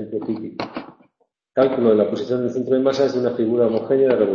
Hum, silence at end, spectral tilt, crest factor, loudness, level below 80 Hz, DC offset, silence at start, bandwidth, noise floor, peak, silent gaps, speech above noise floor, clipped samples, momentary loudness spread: none; 0 s; -7 dB/octave; 16 dB; -20 LUFS; -60 dBFS; under 0.1%; 0 s; 7 kHz; -67 dBFS; -4 dBFS; none; 49 dB; under 0.1%; 12 LU